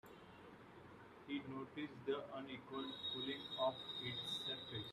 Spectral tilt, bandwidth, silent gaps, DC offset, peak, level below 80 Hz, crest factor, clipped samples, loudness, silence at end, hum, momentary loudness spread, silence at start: -5 dB/octave; 14.5 kHz; none; under 0.1%; -28 dBFS; -80 dBFS; 20 dB; under 0.1%; -45 LUFS; 0 s; none; 18 LU; 0.05 s